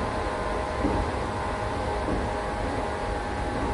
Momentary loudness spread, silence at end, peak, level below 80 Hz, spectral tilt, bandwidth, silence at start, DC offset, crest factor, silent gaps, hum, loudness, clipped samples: 3 LU; 0 s; -14 dBFS; -36 dBFS; -6 dB/octave; 11.5 kHz; 0 s; under 0.1%; 14 dB; none; none; -29 LUFS; under 0.1%